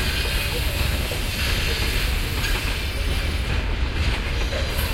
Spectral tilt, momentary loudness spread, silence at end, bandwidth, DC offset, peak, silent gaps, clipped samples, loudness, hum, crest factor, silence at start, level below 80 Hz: -4 dB/octave; 3 LU; 0 s; 16.5 kHz; under 0.1%; -8 dBFS; none; under 0.1%; -24 LUFS; none; 14 dB; 0 s; -26 dBFS